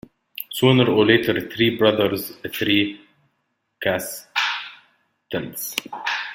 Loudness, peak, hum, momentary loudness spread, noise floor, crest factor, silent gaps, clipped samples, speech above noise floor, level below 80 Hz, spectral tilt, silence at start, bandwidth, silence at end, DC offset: -21 LUFS; -2 dBFS; none; 14 LU; -73 dBFS; 20 dB; none; under 0.1%; 53 dB; -58 dBFS; -5 dB/octave; 0.35 s; 17 kHz; 0 s; under 0.1%